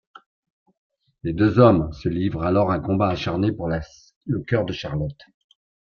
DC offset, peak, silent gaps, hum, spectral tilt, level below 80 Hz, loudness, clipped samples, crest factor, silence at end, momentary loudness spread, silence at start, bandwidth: under 0.1%; -2 dBFS; 4.16-4.21 s; none; -8.5 dB/octave; -46 dBFS; -22 LUFS; under 0.1%; 20 dB; 0.65 s; 14 LU; 1.25 s; 6.8 kHz